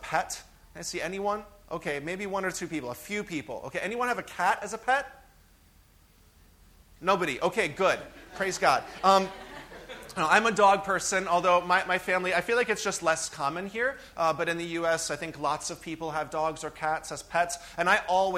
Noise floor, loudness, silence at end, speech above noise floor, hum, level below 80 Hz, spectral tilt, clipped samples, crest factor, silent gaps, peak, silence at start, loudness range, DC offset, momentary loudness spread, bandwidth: -59 dBFS; -28 LUFS; 0 s; 31 dB; none; -58 dBFS; -3 dB/octave; under 0.1%; 22 dB; none; -6 dBFS; 0 s; 8 LU; under 0.1%; 13 LU; 16.5 kHz